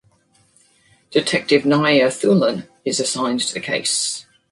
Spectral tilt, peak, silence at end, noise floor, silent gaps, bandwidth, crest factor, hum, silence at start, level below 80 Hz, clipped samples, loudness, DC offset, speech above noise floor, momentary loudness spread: -3.5 dB/octave; -2 dBFS; 0.3 s; -58 dBFS; none; 11.5 kHz; 18 dB; none; 1.1 s; -62 dBFS; under 0.1%; -18 LUFS; under 0.1%; 40 dB; 8 LU